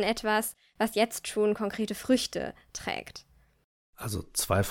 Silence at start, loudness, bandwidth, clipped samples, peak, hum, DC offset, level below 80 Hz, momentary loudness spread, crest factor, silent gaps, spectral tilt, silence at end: 0 s; -30 LUFS; 19 kHz; under 0.1%; -12 dBFS; none; under 0.1%; -54 dBFS; 11 LU; 18 dB; 3.64-3.93 s; -4 dB/octave; 0 s